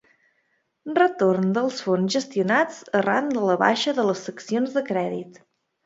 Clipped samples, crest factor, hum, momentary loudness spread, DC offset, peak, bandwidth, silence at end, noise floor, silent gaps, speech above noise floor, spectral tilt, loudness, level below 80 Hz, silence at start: under 0.1%; 20 dB; none; 8 LU; under 0.1%; -2 dBFS; 8 kHz; 0.55 s; -70 dBFS; none; 48 dB; -5 dB/octave; -23 LUFS; -72 dBFS; 0.85 s